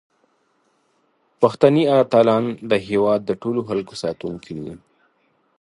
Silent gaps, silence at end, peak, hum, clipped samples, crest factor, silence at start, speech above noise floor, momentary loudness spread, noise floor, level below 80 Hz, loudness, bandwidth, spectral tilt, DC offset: none; 0.85 s; 0 dBFS; none; under 0.1%; 20 dB; 1.4 s; 46 dB; 16 LU; -65 dBFS; -58 dBFS; -19 LUFS; 11 kHz; -7 dB/octave; under 0.1%